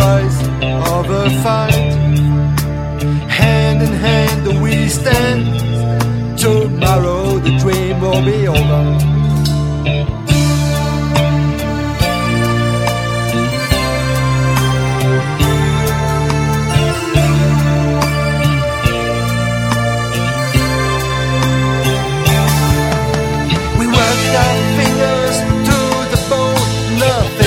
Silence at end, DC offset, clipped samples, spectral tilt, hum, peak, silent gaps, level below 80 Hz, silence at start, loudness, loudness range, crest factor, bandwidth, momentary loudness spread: 0 s; under 0.1%; under 0.1%; -5.5 dB/octave; none; 0 dBFS; none; -26 dBFS; 0 s; -14 LUFS; 2 LU; 12 dB; 16.5 kHz; 4 LU